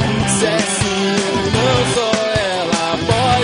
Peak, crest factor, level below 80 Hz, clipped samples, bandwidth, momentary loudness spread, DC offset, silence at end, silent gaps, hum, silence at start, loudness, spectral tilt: -2 dBFS; 14 dB; -38 dBFS; under 0.1%; 11 kHz; 3 LU; under 0.1%; 0 s; none; none; 0 s; -16 LUFS; -4 dB/octave